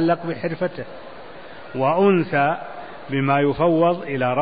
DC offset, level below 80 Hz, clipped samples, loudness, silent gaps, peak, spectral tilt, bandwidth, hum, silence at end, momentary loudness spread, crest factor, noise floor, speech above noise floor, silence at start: 0.8%; -54 dBFS; under 0.1%; -20 LUFS; none; -4 dBFS; -12 dB/octave; 5 kHz; none; 0 s; 21 LU; 16 dB; -39 dBFS; 19 dB; 0 s